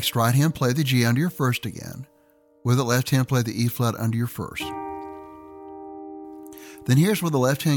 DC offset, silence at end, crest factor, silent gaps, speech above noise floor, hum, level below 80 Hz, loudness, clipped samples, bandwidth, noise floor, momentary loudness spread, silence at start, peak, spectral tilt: under 0.1%; 0 s; 16 dB; none; 37 dB; none; -58 dBFS; -23 LUFS; under 0.1%; 19 kHz; -59 dBFS; 20 LU; 0 s; -8 dBFS; -5.5 dB/octave